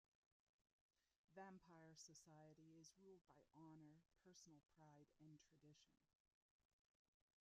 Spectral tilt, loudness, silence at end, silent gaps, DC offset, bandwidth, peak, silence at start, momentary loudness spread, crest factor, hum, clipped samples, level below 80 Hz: -5 dB/octave; -67 LUFS; 0.8 s; 0.72-0.89 s, 1.18-1.28 s, 3.21-3.25 s, 6.15-6.25 s, 6.34-6.59 s; under 0.1%; 7.6 kHz; -48 dBFS; 0.6 s; 5 LU; 22 dB; none; under 0.1%; under -90 dBFS